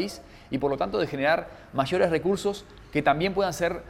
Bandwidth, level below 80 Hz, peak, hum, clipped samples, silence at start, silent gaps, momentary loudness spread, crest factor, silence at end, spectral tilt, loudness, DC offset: 16 kHz; -52 dBFS; -8 dBFS; none; under 0.1%; 0 s; none; 10 LU; 18 dB; 0 s; -5.5 dB/octave; -26 LUFS; under 0.1%